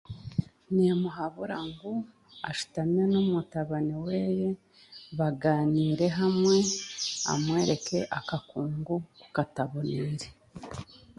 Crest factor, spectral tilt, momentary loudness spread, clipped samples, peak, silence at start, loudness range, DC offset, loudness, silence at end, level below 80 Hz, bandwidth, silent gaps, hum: 18 dB; -5.5 dB/octave; 15 LU; under 0.1%; -10 dBFS; 0.1 s; 4 LU; under 0.1%; -29 LUFS; 0.2 s; -60 dBFS; 11.5 kHz; none; none